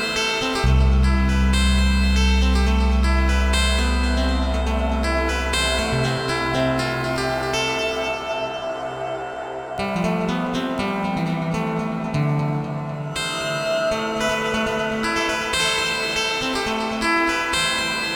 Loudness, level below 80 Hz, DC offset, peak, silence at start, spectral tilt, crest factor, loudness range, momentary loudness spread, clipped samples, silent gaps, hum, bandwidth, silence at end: -21 LUFS; -24 dBFS; under 0.1%; -6 dBFS; 0 s; -4.5 dB/octave; 14 dB; 5 LU; 7 LU; under 0.1%; none; none; 19.5 kHz; 0 s